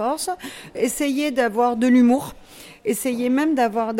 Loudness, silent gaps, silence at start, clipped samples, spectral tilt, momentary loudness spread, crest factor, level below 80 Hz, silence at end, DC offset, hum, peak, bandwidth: -20 LUFS; none; 0 s; under 0.1%; -4 dB/octave; 13 LU; 12 dB; -56 dBFS; 0 s; under 0.1%; none; -8 dBFS; 16.5 kHz